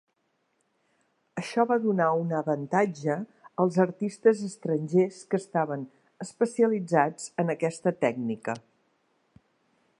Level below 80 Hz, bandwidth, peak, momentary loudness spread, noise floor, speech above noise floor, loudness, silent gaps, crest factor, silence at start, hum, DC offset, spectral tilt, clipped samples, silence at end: -78 dBFS; 11 kHz; -8 dBFS; 12 LU; -74 dBFS; 48 dB; -27 LUFS; none; 22 dB; 1.35 s; none; under 0.1%; -7 dB/octave; under 0.1%; 1.4 s